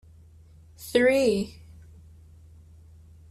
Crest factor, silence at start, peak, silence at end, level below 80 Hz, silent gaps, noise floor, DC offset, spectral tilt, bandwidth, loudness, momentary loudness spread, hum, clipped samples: 20 dB; 0.8 s; -8 dBFS; 1.8 s; -56 dBFS; none; -52 dBFS; under 0.1%; -5 dB/octave; 14 kHz; -24 LUFS; 17 LU; none; under 0.1%